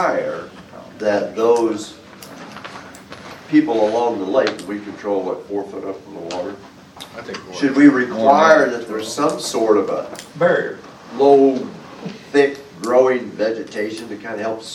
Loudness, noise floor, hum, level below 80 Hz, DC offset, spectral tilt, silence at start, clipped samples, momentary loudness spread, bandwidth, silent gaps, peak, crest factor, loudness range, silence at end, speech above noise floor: -18 LUFS; -37 dBFS; none; -62 dBFS; under 0.1%; -5 dB/octave; 0 s; under 0.1%; 23 LU; 14 kHz; none; 0 dBFS; 18 dB; 7 LU; 0 s; 20 dB